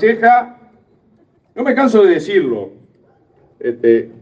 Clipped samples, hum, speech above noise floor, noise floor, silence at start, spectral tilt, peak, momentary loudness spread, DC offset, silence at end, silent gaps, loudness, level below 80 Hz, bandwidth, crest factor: under 0.1%; none; 41 dB; -54 dBFS; 0 s; -6.5 dB/octave; 0 dBFS; 18 LU; under 0.1%; 0.15 s; none; -14 LUFS; -64 dBFS; 8 kHz; 16 dB